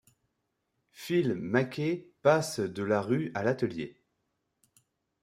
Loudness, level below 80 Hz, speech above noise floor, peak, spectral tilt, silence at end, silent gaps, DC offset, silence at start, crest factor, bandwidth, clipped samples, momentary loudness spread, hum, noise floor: -30 LUFS; -72 dBFS; 52 dB; -10 dBFS; -6 dB/octave; 1.3 s; none; under 0.1%; 0.95 s; 22 dB; 16 kHz; under 0.1%; 8 LU; none; -81 dBFS